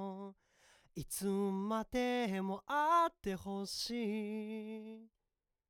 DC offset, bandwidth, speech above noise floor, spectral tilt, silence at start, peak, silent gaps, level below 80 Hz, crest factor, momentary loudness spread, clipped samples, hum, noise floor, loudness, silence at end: under 0.1%; over 20 kHz; 51 dB; -4.5 dB/octave; 0 s; -22 dBFS; none; -66 dBFS; 16 dB; 18 LU; under 0.1%; none; -89 dBFS; -37 LUFS; 0.65 s